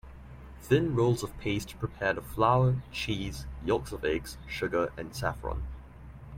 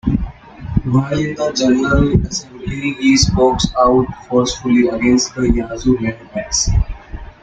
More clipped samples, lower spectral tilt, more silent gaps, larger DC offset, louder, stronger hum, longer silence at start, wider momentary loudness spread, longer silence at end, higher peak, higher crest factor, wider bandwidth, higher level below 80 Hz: neither; about the same, -6 dB/octave vs -5 dB/octave; neither; neither; second, -30 LUFS vs -16 LUFS; neither; about the same, 0.05 s vs 0.05 s; first, 21 LU vs 11 LU; second, 0 s vs 0.15 s; second, -10 dBFS vs -2 dBFS; first, 20 dB vs 14 dB; first, 16.5 kHz vs 9.2 kHz; second, -44 dBFS vs -26 dBFS